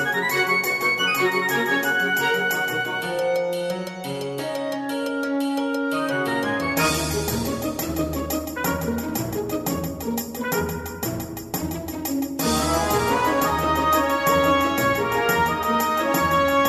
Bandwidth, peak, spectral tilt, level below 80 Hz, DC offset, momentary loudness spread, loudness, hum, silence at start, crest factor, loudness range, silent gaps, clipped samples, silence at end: 14 kHz; -6 dBFS; -4 dB/octave; -42 dBFS; under 0.1%; 9 LU; -22 LUFS; none; 0 s; 16 dB; 6 LU; none; under 0.1%; 0 s